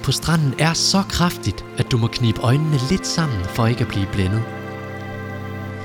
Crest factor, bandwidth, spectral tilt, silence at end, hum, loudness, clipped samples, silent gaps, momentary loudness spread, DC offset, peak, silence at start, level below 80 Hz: 18 dB; 17.5 kHz; -5 dB/octave; 0 s; none; -20 LUFS; under 0.1%; none; 13 LU; under 0.1%; -2 dBFS; 0 s; -38 dBFS